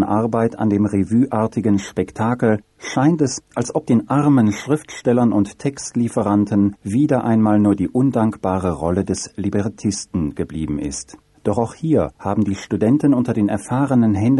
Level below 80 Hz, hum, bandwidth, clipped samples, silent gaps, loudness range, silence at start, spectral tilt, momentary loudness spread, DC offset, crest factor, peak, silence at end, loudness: -46 dBFS; none; 11.5 kHz; under 0.1%; none; 4 LU; 0 s; -7 dB/octave; 8 LU; under 0.1%; 14 dB; -4 dBFS; 0 s; -19 LUFS